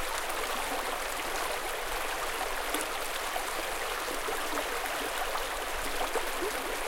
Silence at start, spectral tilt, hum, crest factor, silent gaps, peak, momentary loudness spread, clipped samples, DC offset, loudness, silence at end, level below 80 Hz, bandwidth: 0 s; -1 dB/octave; none; 20 dB; none; -14 dBFS; 1 LU; under 0.1%; under 0.1%; -32 LUFS; 0 s; -46 dBFS; 17 kHz